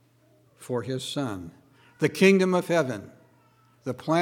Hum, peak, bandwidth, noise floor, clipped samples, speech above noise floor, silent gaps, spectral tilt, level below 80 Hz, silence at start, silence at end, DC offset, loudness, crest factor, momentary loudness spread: none; -6 dBFS; 16.5 kHz; -61 dBFS; under 0.1%; 37 dB; none; -5.5 dB/octave; -70 dBFS; 0.6 s; 0 s; under 0.1%; -25 LUFS; 22 dB; 19 LU